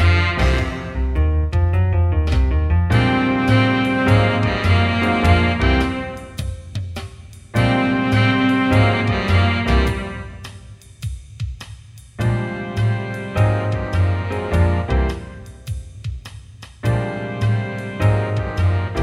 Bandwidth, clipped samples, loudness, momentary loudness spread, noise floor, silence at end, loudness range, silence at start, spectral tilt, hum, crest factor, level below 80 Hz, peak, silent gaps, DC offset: 12 kHz; under 0.1%; -18 LUFS; 15 LU; -39 dBFS; 0 s; 7 LU; 0 s; -7 dB/octave; none; 16 dB; -26 dBFS; -2 dBFS; none; under 0.1%